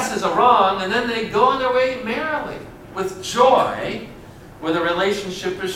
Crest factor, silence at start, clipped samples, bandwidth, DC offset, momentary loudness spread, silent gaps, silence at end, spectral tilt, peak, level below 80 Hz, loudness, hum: 18 dB; 0 s; under 0.1%; 16 kHz; under 0.1%; 14 LU; none; 0 s; -4 dB/octave; -2 dBFS; -48 dBFS; -19 LUFS; none